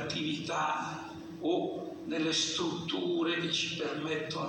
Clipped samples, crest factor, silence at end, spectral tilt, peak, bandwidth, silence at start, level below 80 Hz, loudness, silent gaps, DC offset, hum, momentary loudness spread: under 0.1%; 16 dB; 0 s; -3.5 dB/octave; -18 dBFS; 10 kHz; 0 s; -72 dBFS; -33 LUFS; none; under 0.1%; none; 8 LU